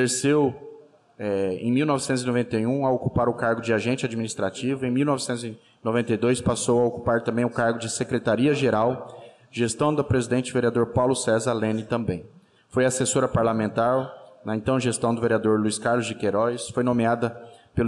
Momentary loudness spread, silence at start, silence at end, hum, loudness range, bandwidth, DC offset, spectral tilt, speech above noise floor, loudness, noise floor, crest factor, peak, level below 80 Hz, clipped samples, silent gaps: 8 LU; 0 s; 0 s; none; 2 LU; 12.5 kHz; under 0.1%; -5.5 dB/octave; 25 dB; -24 LUFS; -48 dBFS; 12 dB; -12 dBFS; -52 dBFS; under 0.1%; none